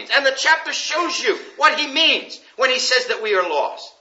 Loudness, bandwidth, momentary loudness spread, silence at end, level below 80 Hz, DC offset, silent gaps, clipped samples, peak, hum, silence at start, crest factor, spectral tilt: -18 LUFS; 8 kHz; 7 LU; 0.1 s; -84 dBFS; under 0.1%; none; under 0.1%; -2 dBFS; none; 0 s; 18 dB; 1 dB/octave